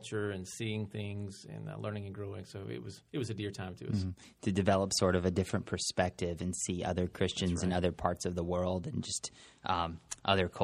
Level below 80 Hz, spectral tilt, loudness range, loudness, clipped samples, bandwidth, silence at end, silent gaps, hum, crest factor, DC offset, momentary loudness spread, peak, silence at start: -56 dBFS; -5 dB/octave; 8 LU; -35 LUFS; under 0.1%; 14.5 kHz; 0 s; none; none; 24 dB; under 0.1%; 13 LU; -10 dBFS; 0 s